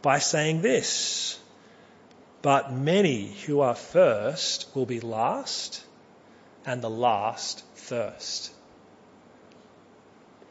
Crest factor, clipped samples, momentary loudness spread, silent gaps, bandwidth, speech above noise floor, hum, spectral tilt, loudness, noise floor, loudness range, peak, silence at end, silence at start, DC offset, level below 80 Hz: 22 dB; under 0.1%; 12 LU; none; 8 kHz; 29 dB; none; -3.5 dB/octave; -26 LUFS; -54 dBFS; 7 LU; -6 dBFS; 2 s; 0 s; under 0.1%; -74 dBFS